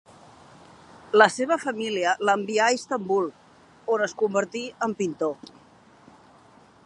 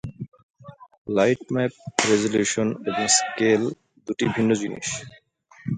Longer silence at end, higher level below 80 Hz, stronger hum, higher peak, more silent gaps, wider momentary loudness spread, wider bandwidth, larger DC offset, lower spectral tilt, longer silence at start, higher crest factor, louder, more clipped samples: first, 1.5 s vs 0 s; second, -72 dBFS vs -58 dBFS; neither; about the same, -2 dBFS vs 0 dBFS; second, none vs 0.43-0.54 s, 0.98-1.05 s; second, 11 LU vs 18 LU; first, 11 kHz vs 9.6 kHz; neither; about the same, -3.5 dB/octave vs -3.5 dB/octave; first, 1.1 s vs 0.05 s; about the same, 24 dB vs 24 dB; about the same, -24 LUFS vs -23 LUFS; neither